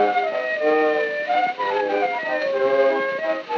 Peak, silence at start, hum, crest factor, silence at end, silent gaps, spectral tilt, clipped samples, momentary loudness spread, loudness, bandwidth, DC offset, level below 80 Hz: -8 dBFS; 0 s; none; 14 dB; 0 s; none; -4.5 dB/octave; under 0.1%; 4 LU; -21 LUFS; 7 kHz; under 0.1%; -88 dBFS